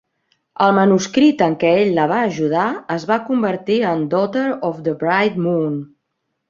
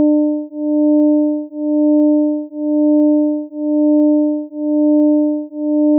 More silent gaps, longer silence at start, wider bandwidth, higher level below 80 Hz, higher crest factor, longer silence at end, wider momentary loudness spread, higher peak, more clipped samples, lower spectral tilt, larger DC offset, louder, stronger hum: neither; first, 0.6 s vs 0 s; first, 7.6 kHz vs 1 kHz; first, -60 dBFS vs under -90 dBFS; first, 16 dB vs 6 dB; first, 0.65 s vs 0 s; about the same, 8 LU vs 8 LU; first, -2 dBFS vs -6 dBFS; neither; second, -6 dB/octave vs -12 dB/octave; neither; about the same, -17 LUFS vs -15 LUFS; neither